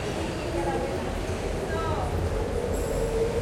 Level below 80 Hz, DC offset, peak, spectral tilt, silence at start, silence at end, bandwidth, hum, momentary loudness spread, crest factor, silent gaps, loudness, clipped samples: -36 dBFS; under 0.1%; -16 dBFS; -6 dB/octave; 0 s; 0 s; 16 kHz; none; 3 LU; 12 dB; none; -29 LUFS; under 0.1%